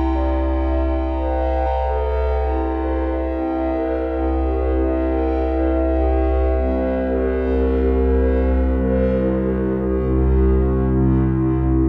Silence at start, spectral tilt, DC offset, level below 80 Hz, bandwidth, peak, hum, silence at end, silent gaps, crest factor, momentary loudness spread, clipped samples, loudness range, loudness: 0 s; -11 dB/octave; under 0.1%; -22 dBFS; 4.1 kHz; -6 dBFS; none; 0 s; none; 10 dB; 4 LU; under 0.1%; 3 LU; -20 LUFS